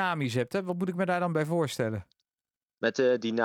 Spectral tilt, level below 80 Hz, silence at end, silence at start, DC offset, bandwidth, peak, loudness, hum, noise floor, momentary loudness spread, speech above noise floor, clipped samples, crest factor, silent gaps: -6 dB/octave; -72 dBFS; 0 s; 0 s; under 0.1%; 16.5 kHz; -10 dBFS; -29 LUFS; none; under -90 dBFS; 6 LU; over 62 dB; under 0.1%; 18 dB; 2.57-2.61 s